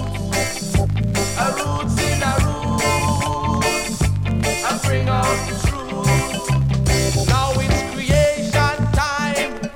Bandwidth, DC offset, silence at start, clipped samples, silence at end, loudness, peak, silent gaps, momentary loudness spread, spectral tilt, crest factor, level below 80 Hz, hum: 17 kHz; under 0.1%; 0 s; under 0.1%; 0 s; -19 LUFS; -2 dBFS; none; 4 LU; -4.5 dB/octave; 16 dB; -28 dBFS; none